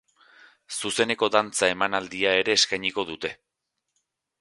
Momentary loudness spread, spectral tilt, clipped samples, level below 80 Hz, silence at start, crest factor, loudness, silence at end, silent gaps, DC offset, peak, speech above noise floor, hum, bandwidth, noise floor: 11 LU; -1.5 dB/octave; under 0.1%; -64 dBFS; 0.7 s; 26 dB; -24 LUFS; 1.05 s; none; under 0.1%; -2 dBFS; 57 dB; none; 11.5 kHz; -82 dBFS